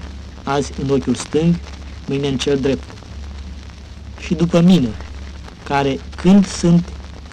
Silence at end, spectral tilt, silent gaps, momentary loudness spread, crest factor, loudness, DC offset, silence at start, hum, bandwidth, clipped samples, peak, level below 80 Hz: 0 s; -6.5 dB/octave; none; 21 LU; 12 dB; -17 LUFS; under 0.1%; 0 s; none; 9.8 kHz; under 0.1%; -6 dBFS; -34 dBFS